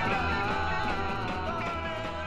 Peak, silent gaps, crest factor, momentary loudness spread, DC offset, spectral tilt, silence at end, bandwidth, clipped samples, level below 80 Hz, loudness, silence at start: -16 dBFS; none; 14 dB; 4 LU; under 0.1%; -5.5 dB/octave; 0 s; 11.5 kHz; under 0.1%; -42 dBFS; -31 LUFS; 0 s